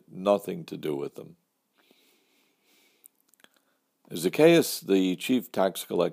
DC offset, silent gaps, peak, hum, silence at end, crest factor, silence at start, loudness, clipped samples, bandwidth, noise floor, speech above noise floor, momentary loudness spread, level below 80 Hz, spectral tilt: under 0.1%; none; -6 dBFS; none; 0 s; 22 dB; 0.15 s; -26 LUFS; under 0.1%; 15.5 kHz; -71 dBFS; 46 dB; 17 LU; -78 dBFS; -5 dB/octave